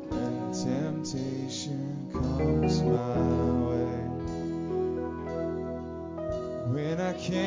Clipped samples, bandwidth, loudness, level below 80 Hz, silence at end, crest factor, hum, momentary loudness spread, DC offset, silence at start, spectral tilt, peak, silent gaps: under 0.1%; 7.6 kHz; -31 LUFS; -44 dBFS; 0 s; 16 dB; none; 8 LU; under 0.1%; 0 s; -7 dB/octave; -14 dBFS; none